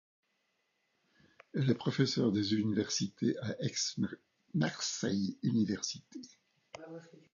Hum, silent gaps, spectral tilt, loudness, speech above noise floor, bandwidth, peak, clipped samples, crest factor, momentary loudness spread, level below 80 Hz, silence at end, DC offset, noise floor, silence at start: none; none; -5 dB/octave; -34 LUFS; 45 dB; 7.4 kHz; -16 dBFS; under 0.1%; 20 dB; 19 LU; -70 dBFS; 0.15 s; under 0.1%; -79 dBFS; 1.55 s